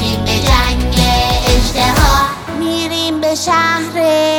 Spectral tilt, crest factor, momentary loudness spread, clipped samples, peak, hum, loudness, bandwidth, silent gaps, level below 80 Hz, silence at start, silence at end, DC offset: -4 dB/octave; 12 dB; 5 LU; under 0.1%; 0 dBFS; none; -13 LUFS; over 20 kHz; none; -18 dBFS; 0 s; 0 s; under 0.1%